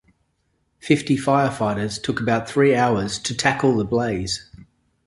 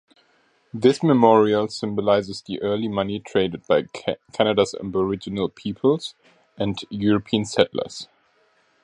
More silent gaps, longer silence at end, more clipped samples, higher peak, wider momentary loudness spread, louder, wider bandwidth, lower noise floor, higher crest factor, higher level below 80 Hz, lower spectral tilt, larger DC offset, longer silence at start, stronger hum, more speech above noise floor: neither; second, 0.65 s vs 0.8 s; neither; about the same, -2 dBFS vs 0 dBFS; second, 7 LU vs 12 LU; about the same, -21 LUFS vs -22 LUFS; about the same, 11.5 kHz vs 11 kHz; first, -69 dBFS vs -62 dBFS; about the same, 20 dB vs 22 dB; first, -48 dBFS vs -56 dBFS; about the same, -5 dB/octave vs -6 dB/octave; neither; about the same, 0.85 s vs 0.75 s; neither; first, 49 dB vs 41 dB